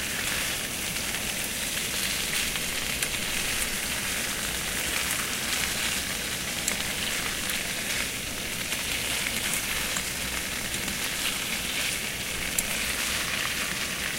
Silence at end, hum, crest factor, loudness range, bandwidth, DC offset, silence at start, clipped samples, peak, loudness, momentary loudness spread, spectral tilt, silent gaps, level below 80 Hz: 0 s; none; 24 dB; 1 LU; 16 kHz; under 0.1%; 0 s; under 0.1%; -4 dBFS; -27 LUFS; 3 LU; -1 dB/octave; none; -46 dBFS